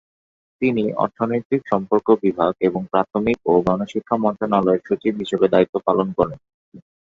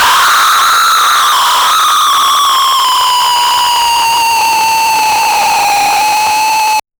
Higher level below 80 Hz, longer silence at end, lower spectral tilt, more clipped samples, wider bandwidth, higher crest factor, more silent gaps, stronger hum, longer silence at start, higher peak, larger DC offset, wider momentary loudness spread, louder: second, -54 dBFS vs -48 dBFS; about the same, 0.2 s vs 0.2 s; first, -8 dB/octave vs 1.5 dB/octave; neither; second, 7.6 kHz vs over 20 kHz; first, 18 dB vs 8 dB; first, 1.45-1.50 s, 5.69-5.73 s, 6.54-6.72 s vs none; neither; first, 0.6 s vs 0 s; about the same, -2 dBFS vs 0 dBFS; neither; about the same, 5 LU vs 3 LU; second, -20 LUFS vs -8 LUFS